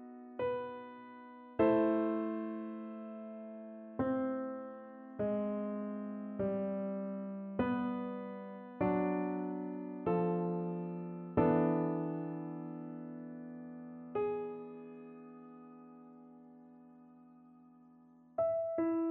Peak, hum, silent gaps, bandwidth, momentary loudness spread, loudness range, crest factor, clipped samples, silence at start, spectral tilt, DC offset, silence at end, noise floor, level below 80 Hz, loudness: -18 dBFS; none; none; 4.3 kHz; 19 LU; 10 LU; 20 dB; under 0.1%; 0 s; -8 dB/octave; under 0.1%; 0 s; -62 dBFS; -70 dBFS; -37 LUFS